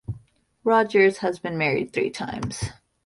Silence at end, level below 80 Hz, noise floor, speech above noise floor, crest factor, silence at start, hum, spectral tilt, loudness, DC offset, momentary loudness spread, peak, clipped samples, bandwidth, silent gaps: 0.35 s; -50 dBFS; -52 dBFS; 30 dB; 18 dB; 0.1 s; none; -5.5 dB/octave; -23 LUFS; under 0.1%; 15 LU; -6 dBFS; under 0.1%; 11.5 kHz; none